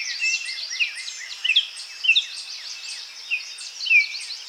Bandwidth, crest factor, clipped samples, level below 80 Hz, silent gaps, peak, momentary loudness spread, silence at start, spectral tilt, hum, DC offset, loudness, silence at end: 17.5 kHz; 18 dB; under 0.1%; under -90 dBFS; none; -6 dBFS; 15 LU; 0 s; 6.5 dB/octave; none; under 0.1%; -22 LUFS; 0 s